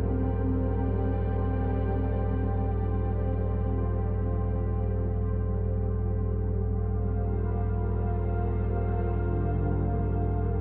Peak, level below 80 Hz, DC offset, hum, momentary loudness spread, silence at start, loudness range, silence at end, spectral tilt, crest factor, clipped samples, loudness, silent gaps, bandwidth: -16 dBFS; -30 dBFS; under 0.1%; none; 1 LU; 0 s; 1 LU; 0 s; -11 dB/octave; 10 dB; under 0.1%; -29 LUFS; none; 3.1 kHz